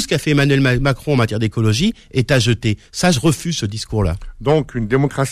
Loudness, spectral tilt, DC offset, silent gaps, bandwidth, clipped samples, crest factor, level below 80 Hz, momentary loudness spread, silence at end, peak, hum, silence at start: -17 LUFS; -5.5 dB/octave; under 0.1%; none; 14.5 kHz; under 0.1%; 12 dB; -34 dBFS; 7 LU; 0 s; -4 dBFS; none; 0 s